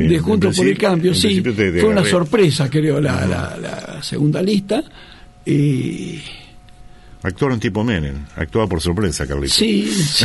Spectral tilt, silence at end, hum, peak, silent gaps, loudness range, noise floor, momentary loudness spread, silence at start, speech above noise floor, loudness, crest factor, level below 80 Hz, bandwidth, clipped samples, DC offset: -5 dB/octave; 0 s; none; -2 dBFS; none; 7 LU; -40 dBFS; 12 LU; 0 s; 23 dB; -17 LUFS; 16 dB; -36 dBFS; 12 kHz; under 0.1%; under 0.1%